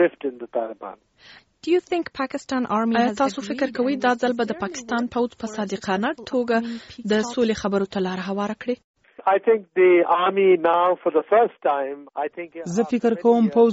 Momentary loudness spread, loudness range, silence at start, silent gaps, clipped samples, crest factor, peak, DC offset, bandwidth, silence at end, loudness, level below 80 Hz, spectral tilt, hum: 12 LU; 5 LU; 0 s; 8.84-8.94 s; under 0.1%; 16 dB; -6 dBFS; under 0.1%; 8 kHz; 0 s; -22 LUFS; -62 dBFS; -4 dB/octave; none